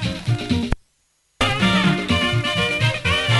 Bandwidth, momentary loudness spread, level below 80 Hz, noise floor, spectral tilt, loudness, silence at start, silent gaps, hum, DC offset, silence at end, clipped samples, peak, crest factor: 11.5 kHz; 7 LU; -36 dBFS; -65 dBFS; -5 dB/octave; -19 LUFS; 0 s; none; none; under 0.1%; 0 s; under 0.1%; -2 dBFS; 18 dB